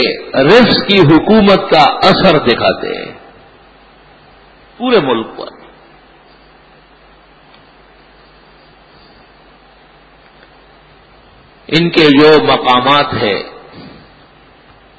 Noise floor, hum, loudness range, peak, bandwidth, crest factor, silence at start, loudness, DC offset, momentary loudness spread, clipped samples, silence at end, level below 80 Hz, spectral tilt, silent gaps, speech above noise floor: -43 dBFS; none; 11 LU; 0 dBFS; 8 kHz; 14 dB; 0 s; -9 LUFS; under 0.1%; 15 LU; 0.3%; 1.1 s; -44 dBFS; -6.5 dB/octave; none; 34 dB